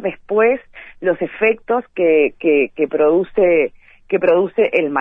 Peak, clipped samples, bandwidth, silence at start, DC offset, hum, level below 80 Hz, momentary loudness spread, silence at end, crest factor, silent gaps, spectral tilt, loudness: -2 dBFS; under 0.1%; 3.8 kHz; 0 s; under 0.1%; none; -52 dBFS; 6 LU; 0 s; 14 dB; none; -8.5 dB/octave; -16 LUFS